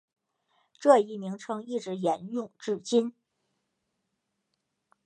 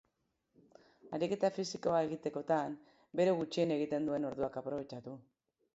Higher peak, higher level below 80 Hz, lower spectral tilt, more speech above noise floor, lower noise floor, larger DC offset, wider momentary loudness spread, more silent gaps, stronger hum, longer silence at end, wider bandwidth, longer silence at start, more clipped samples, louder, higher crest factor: first, -6 dBFS vs -18 dBFS; second, -84 dBFS vs -74 dBFS; about the same, -5.5 dB/octave vs -5.5 dB/octave; first, 54 dB vs 46 dB; about the same, -81 dBFS vs -82 dBFS; neither; about the same, 14 LU vs 13 LU; neither; neither; first, 1.95 s vs 0.55 s; first, 9.8 kHz vs 8 kHz; second, 0.8 s vs 1.05 s; neither; first, -28 LUFS vs -36 LUFS; first, 24 dB vs 18 dB